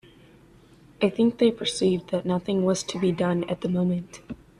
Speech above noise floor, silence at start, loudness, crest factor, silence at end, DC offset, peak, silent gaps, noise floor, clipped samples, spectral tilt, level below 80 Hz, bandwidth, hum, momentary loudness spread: 29 dB; 1 s; -25 LUFS; 16 dB; 0.25 s; under 0.1%; -10 dBFS; none; -53 dBFS; under 0.1%; -6 dB/octave; -58 dBFS; 11 kHz; none; 5 LU